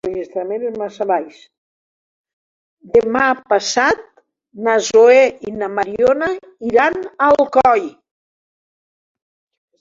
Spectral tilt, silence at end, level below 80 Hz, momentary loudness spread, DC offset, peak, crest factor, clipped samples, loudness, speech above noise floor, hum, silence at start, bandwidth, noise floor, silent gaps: -3.5 dB/octave; 1.9 s; -54 dBFS; 13 LU; under 0.1%; -2 dBFS; 16 dB; under 0.1%; -16 LUFS; over 75 dB; none; 0.05 s; 7.8 kHz; under -90 dBFS; 1.58-2.24 s, 2.33-2.77 s